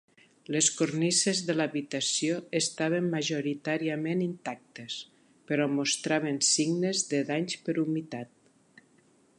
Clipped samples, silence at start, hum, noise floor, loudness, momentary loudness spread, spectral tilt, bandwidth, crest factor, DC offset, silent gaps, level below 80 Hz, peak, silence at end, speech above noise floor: under 0.1%; 0.5 s; none; -64 dBFS; -28 LUFS; 14 LU; -3.5 dB/octave; 11.5 kHz; 18 dB; under 0.1%; none; -80 dBFS; -12 dBFS; 1.15 s; 35 dB